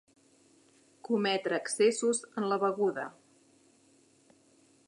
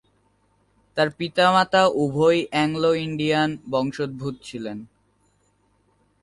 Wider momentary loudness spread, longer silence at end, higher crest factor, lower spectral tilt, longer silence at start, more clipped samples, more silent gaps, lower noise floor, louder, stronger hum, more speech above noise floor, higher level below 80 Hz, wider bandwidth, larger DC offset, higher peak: second, 12 LU vs 15 LU; first, 1.75 s vs 1.35 s; about the same, 18 dB vs 20 dB; second, -3.5 dB/octave vs -5.5 dB/octave; first, 1.1 s vs 0.95 s; neither; neither; about the same, -65 dBFS vs -65 dBFS; second, -30 LUFS vs -22 LUFS; second, none vs 50 Hz at -60 dBFS; second, 35 dB vs 43 dB; second, -86 dBFS vs -60 dBFS; about the same, 11.5 kHz vs 11.5 kHz; neither; second, -16 dBFS vs -4 dBFS